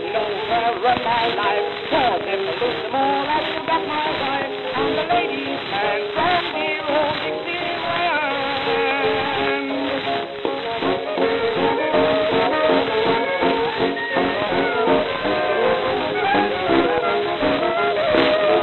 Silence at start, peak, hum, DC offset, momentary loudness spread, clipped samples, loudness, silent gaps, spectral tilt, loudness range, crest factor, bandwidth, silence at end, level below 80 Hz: 0 s; -2 dBFS; none; 0.2%; 5 LU; under 0.1%; -20 LUFS; none; -6.5 dB/octave; 2 LU; 18 dB; 6.6 kHz; 0 s; -52 dBFS